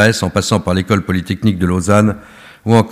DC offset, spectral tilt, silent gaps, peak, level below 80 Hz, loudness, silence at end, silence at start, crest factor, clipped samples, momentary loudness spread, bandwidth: under 0.1%; -5.5 dB/octave; none; 0 dBFS; -40 dBFS; -15 LUFS; 0 s; 0 s; 14 dB; 0.2%; 6 LU; 15.5 kHz